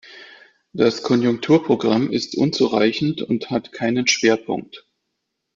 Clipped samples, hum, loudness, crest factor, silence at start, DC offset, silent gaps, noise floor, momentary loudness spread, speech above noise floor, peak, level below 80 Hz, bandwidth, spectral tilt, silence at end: under 0.1%; none; -19 LUFS; 18 dB; 0.05 s; under 0.1%; none; -77 dBFS; 7 LU; 58 dB; -4 dBFS; -60 dBFS; 7.6 kHz; -4.5 dB/octave; 0.75 s